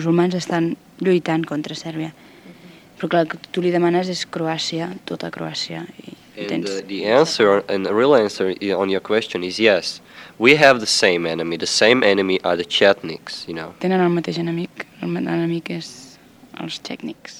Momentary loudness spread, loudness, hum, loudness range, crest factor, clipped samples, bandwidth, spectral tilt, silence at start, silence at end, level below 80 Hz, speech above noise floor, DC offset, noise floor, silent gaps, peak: 15 LU; -19 LUFS; none; 8 LU; 20 dB; under 0.1%; 15.5 kHz; -4.5 dB/octave; 0 s; 0 s; -64 dBFS; 26 dB; under 0.1%; -46 dBFS; none; 0 dBFS